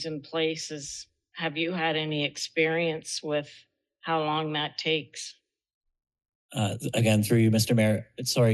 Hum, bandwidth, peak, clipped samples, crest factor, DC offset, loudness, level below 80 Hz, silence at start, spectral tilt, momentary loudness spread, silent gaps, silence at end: none; 12.5 kHz; -12 dBFS; under 0.1%; 16 dB; under 0.1%; -27 LUFS; -68 dBFS; 0 s; -5 dB/octave; 16 LU; 5.74-5.81 s, 6.35-6.49 s; 0 s